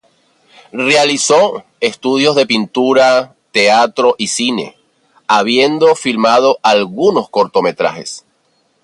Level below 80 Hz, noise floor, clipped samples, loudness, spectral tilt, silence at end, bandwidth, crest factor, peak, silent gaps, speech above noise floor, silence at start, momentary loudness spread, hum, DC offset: -62 dBFS; -59 dBFS; under 0.1%; -12 LUFS; -3 dB/octave; 0.65 s; 11.5 kHz; 14 dB; 0 dBFS; none; 47 dB; 0.75 s; 8 LU; none; under 0.1%